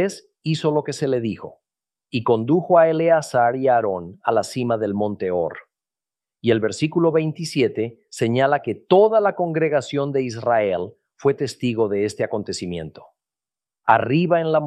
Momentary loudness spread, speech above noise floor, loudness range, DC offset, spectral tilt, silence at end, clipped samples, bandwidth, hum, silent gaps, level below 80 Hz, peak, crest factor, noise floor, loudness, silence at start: 11 LU; over 70 dB; 4 LU; under 0.1%; -6 dB/octave; 0 s; under 0.1%; 12.5 kHz; none; none; -62 dBFS; -2 dBFS; 20 dB; under -90 dBFS; -21 LUFS; 0 s